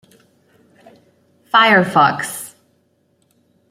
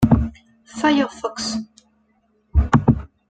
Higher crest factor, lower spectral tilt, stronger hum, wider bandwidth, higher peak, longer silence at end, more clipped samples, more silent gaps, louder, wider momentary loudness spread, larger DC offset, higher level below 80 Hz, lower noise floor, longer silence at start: about the same, 18 dB vs 18 dB; second, -4 dB/octave vs -6.5 dB/octave; neither; first, 16 kHz vs 9.4 kHz; about the same, -2 dBFS vs -2 dBFS; first, 1.2 s vs 0.25 s; neither; neither; first, -14 LUFS vs -20 LUFS; first, 18 LU vs 13 LU; neither; second, -66 dBFS vs -30 dBFS; about the same, -62 dBFS vs -63 dBFS; first, 1.55 s vs 0 s